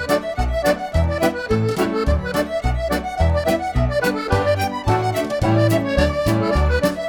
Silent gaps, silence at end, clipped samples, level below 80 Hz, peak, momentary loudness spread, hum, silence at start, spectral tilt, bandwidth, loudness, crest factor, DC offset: none; 0 s; under 0.1%; -26 dBFS; -2 dBFS; 4 LU; none; 0 s; -6.5 dB/octave; over 20 kHz; -20 LUFS; 16 dB; under 0.1%